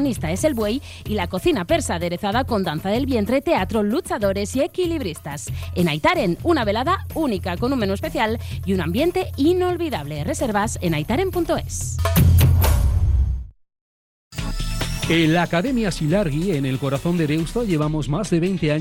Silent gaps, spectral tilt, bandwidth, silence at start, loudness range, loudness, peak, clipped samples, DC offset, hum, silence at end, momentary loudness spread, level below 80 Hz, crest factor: 13.81-14.31 s; -6 dB/octave; 17.5 kHz; 0 s; 2 LU; -21 LUFS; -6 dBFS; under 0.1%; under 0.1%; none; 0 s; 8 LU; -30 dBFS; 14 dB